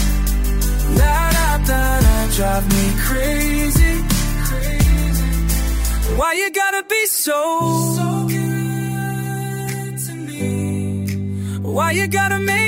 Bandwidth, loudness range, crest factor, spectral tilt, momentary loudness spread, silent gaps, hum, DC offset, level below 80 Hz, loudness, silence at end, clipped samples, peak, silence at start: 16.5 kHz; 5 LU; 14 dB; -4.5 dB/octave; 8 LU; none; none; under 0.1%; -20 dBFS; -18 LUFS; 0 s; under 0.1%; -2 dBFS; 0 s